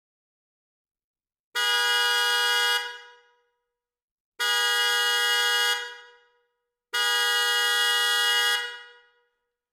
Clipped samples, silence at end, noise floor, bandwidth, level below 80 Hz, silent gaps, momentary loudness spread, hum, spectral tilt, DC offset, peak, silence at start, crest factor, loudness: under 0.1%; 0.85 s; -84 dBFS; 17 kHz; -88 dBFS; 4.02-4.32 s; 9 LU; none; 6 dB/octave; under 0.1%; -8 dBFS; 1.55 s; 18 dB; -22 LUFS